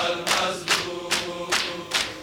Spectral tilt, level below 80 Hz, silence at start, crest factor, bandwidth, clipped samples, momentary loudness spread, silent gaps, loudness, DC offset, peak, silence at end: -1 dB/octave; -56 dBFS; 0 s; 18 dB; over 20 kHz; under 0.1%; 3 LU; none; -24 LUFS; under 0.1%; -8 dBFS; 0 s